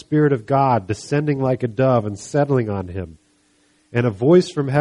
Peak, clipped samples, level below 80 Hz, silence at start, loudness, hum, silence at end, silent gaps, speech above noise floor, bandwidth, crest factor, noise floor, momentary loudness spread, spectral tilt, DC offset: -2 dBFS; under 0.1%; -54 dBFS; 0.1 s; -19 LUFS; none; 0 s; none; 41 dB; 11 kHz; 16 dB; -60 dBFS; 11 LU; -7.5 dB/octave; under 0.1%